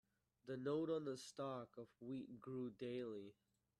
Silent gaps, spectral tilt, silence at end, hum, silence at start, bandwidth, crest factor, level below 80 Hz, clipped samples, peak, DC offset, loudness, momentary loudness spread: none; -6.5 dB/octave; 0.5 s; none; 0.45 s; 13 kHz; 16 dB; -86 dBFS; under 0.1%; -32 dBFS; under 0.1%; -49 LUFS; 13 LU